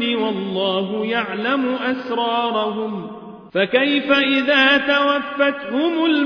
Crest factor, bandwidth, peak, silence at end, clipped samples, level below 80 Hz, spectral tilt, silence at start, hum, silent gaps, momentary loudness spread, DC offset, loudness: 16 dB; 5.4 kHz; -2 dBFS; 0 s; under 0.1%; -62 dBFS; -6 dB/octave; 0 s; none; none; 10 LU; under 0.1%; -18 LUFS